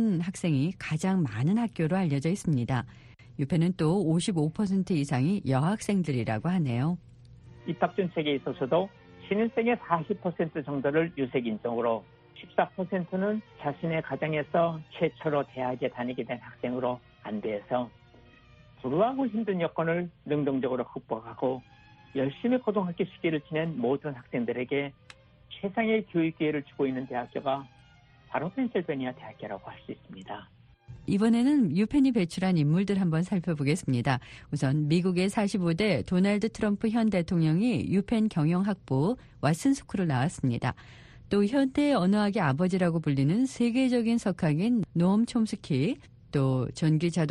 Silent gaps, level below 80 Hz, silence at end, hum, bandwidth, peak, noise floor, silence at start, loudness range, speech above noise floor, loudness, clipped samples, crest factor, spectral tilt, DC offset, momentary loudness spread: none; -58 dBFS; 0 s; none; 11.5 kHz; -10 dBFS; -57 dBFS; 0 s; 5 LU; 29 dB; -28 LUFS; under 0.1%; 18 dB; -7 dB/octave; under 0.1%; 9 LU